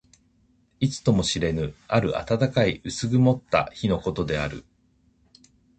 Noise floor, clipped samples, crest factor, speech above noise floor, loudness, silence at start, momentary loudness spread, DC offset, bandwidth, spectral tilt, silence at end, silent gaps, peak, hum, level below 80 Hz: -63 dBFS; under 0.1%; 20 dB; 40 dB; -24 LUFS; 0.8 s; 7 LU; under 0.1%; 9 kHz; -6 dB/octave; 1.15 s; none; -4 dBFS; none; -46 dBFS